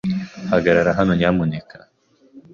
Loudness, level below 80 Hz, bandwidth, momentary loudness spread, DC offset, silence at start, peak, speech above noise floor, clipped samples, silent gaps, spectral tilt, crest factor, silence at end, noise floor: -18 LUFS; -44 dBFS; 7.2 kHz; 10 LU; under 0.1%; 0.05 s; -4 dBFS; 38 dB; under 0.1%; none; -7.5 dB/octave; 16 dB; 0.15 s; -55 dBFS